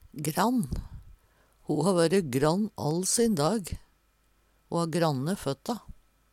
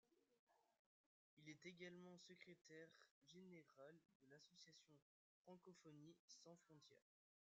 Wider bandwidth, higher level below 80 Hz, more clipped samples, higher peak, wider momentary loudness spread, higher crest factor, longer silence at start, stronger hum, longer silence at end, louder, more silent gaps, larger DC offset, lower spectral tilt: first, 17 kHz vs 7.6 kHz; first, -48 dBFS vs under -90 dBFS; neither; first, -10 dBFS vs -46 dBFS; first, 14 LU vs 8 LU; about the same, 18 dB vs 22 dB; about the same, 0.15 s vs 0.05 s; neither; about the same, 0.55 s vs 0.5 s; first, -28 LUFS vs -66 LUFS; second, none vs 0.39-0.47 s, 0.79-1.37 s, 2.61-2.65 s, 3.11-3.22 s, 4.15-4.20 s, 5.02-5.45 s, 6.19-6.28 s; neither; about the same, -5 dB/octave vs -4 dB/octave